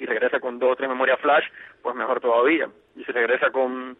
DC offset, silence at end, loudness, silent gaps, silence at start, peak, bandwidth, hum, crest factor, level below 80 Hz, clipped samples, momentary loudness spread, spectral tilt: under 0.1%; 0.05 s; -22 LUFS; none; 0 s; -8 dBFS; 4 kHz; none; 16 dB; -74 dBFS; under 0.1%; 12 LU; -7 dB/octave